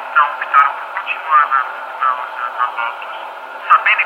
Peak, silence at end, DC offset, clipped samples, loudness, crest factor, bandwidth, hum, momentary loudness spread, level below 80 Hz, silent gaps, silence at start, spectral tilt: 0 dBFS; 0 s; under 0.1%; under 0.1%; -16 LUFS; 16 dB; 9.4 kHz; none; 15 LU; -82 dBFS; none; 0 s; 0 dB/octave